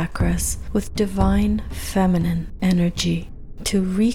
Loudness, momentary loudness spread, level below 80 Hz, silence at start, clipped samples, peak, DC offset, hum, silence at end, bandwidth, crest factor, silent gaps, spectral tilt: -22 LUFS; 6 LU; -30 dBFS; 0 s; under 0.1%; -6 dBFS; under 0.1%; none; 0 s; 16 kHz; 14 dB; none; -5.5 dB/octave